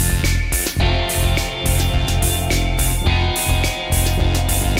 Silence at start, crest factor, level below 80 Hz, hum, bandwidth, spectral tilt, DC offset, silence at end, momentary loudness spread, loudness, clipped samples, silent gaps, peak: 0 s; 12 dB; -20 dBFS; none; 16.5 kHz; -4 dB/octave; under 0.1%; 0 s; 2 LU; -18 LUFS; under 0.1%; none; -6 dBFS